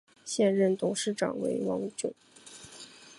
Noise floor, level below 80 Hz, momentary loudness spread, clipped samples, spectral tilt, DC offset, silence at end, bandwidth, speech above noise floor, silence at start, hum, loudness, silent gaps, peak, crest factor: -50 dBFS; -74 dBFS; 21 LU; under 0.1%; -4.5 dB/octave; under 0.1%; 0.05 s; 11.5 kHz; 21 dB; 0.25 s; none; -30 LUFS; none; -14 dBFS; 18 dB